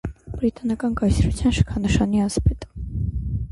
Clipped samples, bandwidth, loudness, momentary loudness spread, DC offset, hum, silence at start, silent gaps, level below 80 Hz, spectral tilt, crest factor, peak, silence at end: under 0.1%; 11.5 kHz; -22 LUFS; 8 LU; under 0.1%; none; 0.05 s; none; -28 dBFS; -6.5 dB/octave; 18 dB; -4 dBFS; 0 s